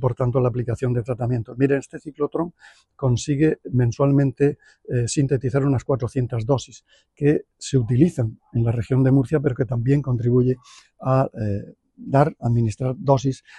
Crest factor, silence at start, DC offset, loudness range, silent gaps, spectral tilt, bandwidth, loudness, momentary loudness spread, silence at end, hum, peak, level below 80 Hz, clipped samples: 18 dB; 0 s; under 0.1%; 3 LU; none; -7.5 dB/octave; 10 kHz; -22 LUFS; 9 LU; 0.2 s; none; -4 dBFS; -46 dBFS; under 0.1%